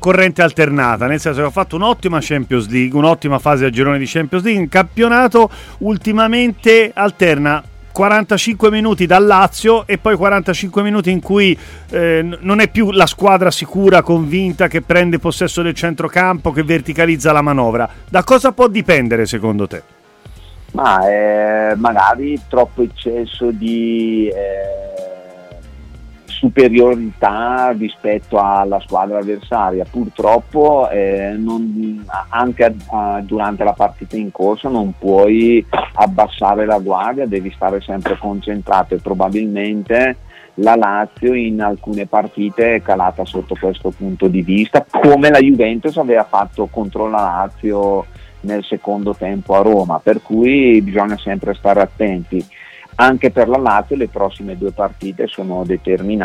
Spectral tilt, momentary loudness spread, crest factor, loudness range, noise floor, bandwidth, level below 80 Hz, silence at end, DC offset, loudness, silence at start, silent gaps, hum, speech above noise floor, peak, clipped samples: -6 dB/octave; 10 LU; 14 dB; 5 LU; -38 dBFS; 16 kHz; -38 dBFS; 0 s; under 0.1%; -14 LUFS; 0 s; none; none; 25 dB; 0 dBFS; under 0.1%